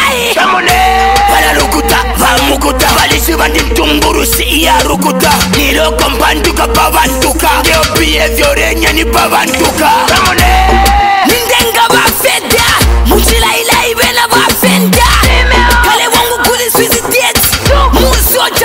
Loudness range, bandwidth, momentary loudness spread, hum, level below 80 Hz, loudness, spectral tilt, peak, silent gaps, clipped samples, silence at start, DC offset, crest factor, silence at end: 1 LU; 16.5 kHz; 2 LU; none; -16 dBFS; -7 LUFS; -3 dB/octave; 0 dBFS; none; under 0.1%; 0 s; 0.3%; 8 dB; 0 s